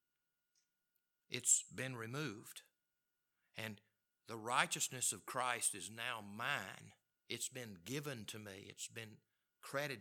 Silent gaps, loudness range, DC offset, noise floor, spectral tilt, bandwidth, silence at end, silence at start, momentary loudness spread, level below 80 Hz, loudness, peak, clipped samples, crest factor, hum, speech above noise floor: none; 6 LU; under 0.1%; -89 dBFS; -1.5 dB/octave; 19 kHz; 0 s; 1.3 s; 18 LU; under -90 dBFS; -41 LUFS; -16 dBFS; under 0.1%; 30 dB; none; 46 dB